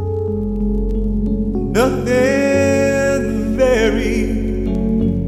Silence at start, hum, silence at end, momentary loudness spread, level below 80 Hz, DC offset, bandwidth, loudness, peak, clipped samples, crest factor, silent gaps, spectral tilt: 0 s; none; 0 s; 6 LU; -24 dBFS; under 0.1%; 14.5 kHz; -17 LUFS; -2 dBFS; under 0.1%; 12 dB; none; -6.5 dB/octave